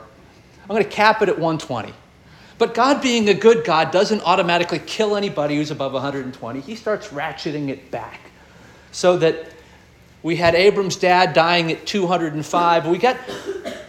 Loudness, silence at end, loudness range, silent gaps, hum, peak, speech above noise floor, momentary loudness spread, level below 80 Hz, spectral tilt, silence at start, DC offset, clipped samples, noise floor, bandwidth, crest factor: -18 LUFS; 0 s; 7 LU; none; none; -2 dBFS; 30 dB; 15 LU; -54 dBFS; -4.5 dB/octave; 0 s; under 0.1%; under 0.1%; -48 dBFS; 13.5 kHz; 18 dB